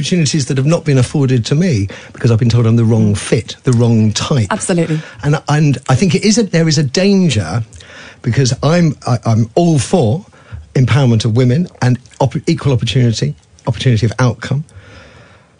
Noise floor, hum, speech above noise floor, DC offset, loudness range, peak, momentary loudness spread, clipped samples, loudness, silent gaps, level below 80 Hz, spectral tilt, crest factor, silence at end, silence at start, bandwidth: -42 dBFS; none; 30 dB; under 0.1%; 2 LU; 0 dBFS; 9 LU; under 0.1%; -13 LUFS; none; -42 dBFS; -6 dB/octave; 12 dB; 0.6 s; 0 s; 10.5 kHz